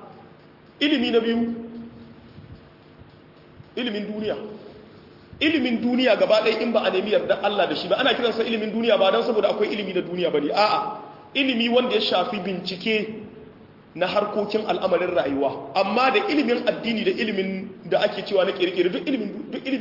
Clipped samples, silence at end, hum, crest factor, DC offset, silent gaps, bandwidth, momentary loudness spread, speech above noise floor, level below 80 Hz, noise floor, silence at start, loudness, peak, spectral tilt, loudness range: under 0.1%; 0 s; none; 18 dB; under 0.1%; none; 5.8 kHz; 11 LU; 27 dB; -62 dBFS; -49 dBFS; 0 s; -22 LUFS; -6 dBFS; -6 dB/octave; 7 LU